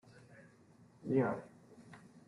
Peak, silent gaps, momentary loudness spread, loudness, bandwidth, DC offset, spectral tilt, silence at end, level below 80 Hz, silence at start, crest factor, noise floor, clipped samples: -20 dBFS; none; 26 LU; -36 LUFS; 11.5 kHz; under 0.1%; -9 dB/octave; 0.1 s; -78 dBFS; 0.15 s; 22 dB; -64 dBFS; under 0.1%